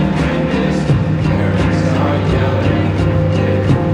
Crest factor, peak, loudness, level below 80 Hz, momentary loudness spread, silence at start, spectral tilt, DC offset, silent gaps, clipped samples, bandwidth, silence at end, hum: 12 dB; -2 dBFS; -15 LUFS; -28 dBFS; 1 LU; 0 s; -8 dB/octave; under 0.1%; none; under 0.1%; 9.8 kHz; 0 s; none